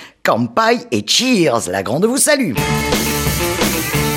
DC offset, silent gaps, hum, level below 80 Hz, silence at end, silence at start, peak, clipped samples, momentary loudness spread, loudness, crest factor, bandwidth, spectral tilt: under 0.1%; none; none; -34 dBFS; 0 s; 0 s; 0 dBFS; under 0.1%; 5 LU; -15 LUFS; 14 dB; 17 kHz; -3.5 dB/octave